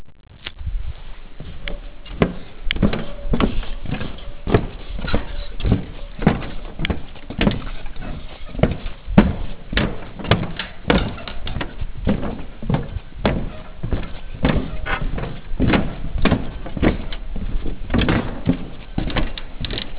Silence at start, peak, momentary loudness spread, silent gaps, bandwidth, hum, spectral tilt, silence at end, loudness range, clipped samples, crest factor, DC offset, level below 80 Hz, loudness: 0 s; 0 dBFS; 14 LU; none; 4 kHz; none; -10.5 dB/octave; 0 s; 4 LU; under 0.1%; 22 dB; 0.3%; -28 dBFS; -23 LUFS